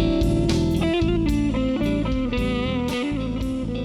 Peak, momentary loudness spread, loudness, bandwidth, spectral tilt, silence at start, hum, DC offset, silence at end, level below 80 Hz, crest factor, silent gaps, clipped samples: -8 dBFS; 5 LU; -23 LUFS; 14 kHz; -7 dB/octave; 0 s; none; under 0.1%; 0 s; -30 dBFS; 14 dB; none; under 0.1%